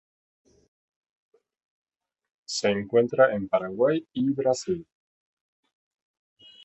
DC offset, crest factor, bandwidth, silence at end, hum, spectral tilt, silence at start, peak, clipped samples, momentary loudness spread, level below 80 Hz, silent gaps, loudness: under 0.1%; 22 dB; 8.4 kHz; 1.85 s; none; -5 dB/octave; 2.5 s; -6 dBFS; under 0.1%; 9 LU; -66 dBFS; none; -25 LUFS